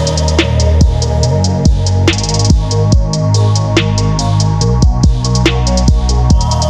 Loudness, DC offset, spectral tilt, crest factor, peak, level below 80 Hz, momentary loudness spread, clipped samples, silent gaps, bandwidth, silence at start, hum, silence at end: -12 LUFS; under 0.1%; -5.5 dB/octave; 10 dB; 0 dBFS; -16 dBFS; 2 LU; under 0.1%; none; 10.5 kHz; 0 s; none; 0 s